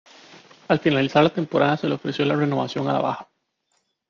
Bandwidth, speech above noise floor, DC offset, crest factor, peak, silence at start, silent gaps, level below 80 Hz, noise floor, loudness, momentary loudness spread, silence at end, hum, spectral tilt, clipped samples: 7.2 kHz; 50 dB; under 0.1%; 18 dB; -4 dBFS; 0.3 s; none; -62 dBFS; -71 dBFS; -22 LUFS; 6 LU; 0.85 s; none; -7 dB/octave; under 0.1%